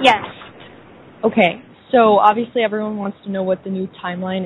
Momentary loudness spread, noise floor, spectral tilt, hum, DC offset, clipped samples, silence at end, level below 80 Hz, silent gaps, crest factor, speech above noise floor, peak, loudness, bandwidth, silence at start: 13 LU; -42 dBFS; -6 dB/octave; none; under 0.1%; under 0.1%; 0 s; -60 dBFS; none; 18 dB; 26 dB; 0 dBFS; -18 LUFS; 10.5 kHz; 0 s